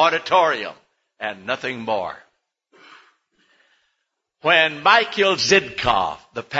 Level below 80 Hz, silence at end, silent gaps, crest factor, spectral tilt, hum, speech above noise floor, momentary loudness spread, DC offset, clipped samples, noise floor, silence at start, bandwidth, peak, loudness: -54 dBFS; 0 s; none; 20 dB; -2.5 dB/octave; none; 56 dB; 15 LU; under 0.1%; under 0.1%; -76 dBFS; 0 s; 8 kHz; 0 dBFS; -19 LUFS